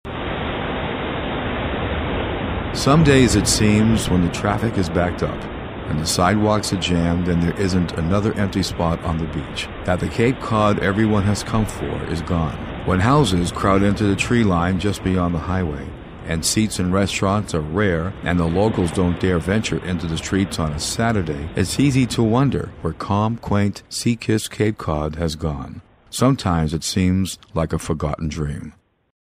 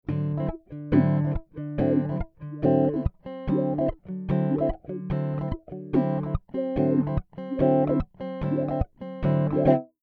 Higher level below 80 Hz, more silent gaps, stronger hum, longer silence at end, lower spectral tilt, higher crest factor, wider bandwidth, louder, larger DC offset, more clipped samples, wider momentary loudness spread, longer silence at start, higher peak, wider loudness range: first, -34 dBFS vs -40 dBFS; neither; neither; first, 0.7 s vs 0.2 s; second, -5.5 dB/octave vs -12 dB/octave; about the same, 20 dB vs 18 dB; first, 15.5 kHz vs 4.6 kHz; first, -20 LUFS vs -26 LUFS; neither; neither; about the same, 9 LU vs 11 LU; about the same, 0.05 s vs 0.1 s; first, 0 dBFS vs -8 dBFS; about the same, 4 LU vs 2 LU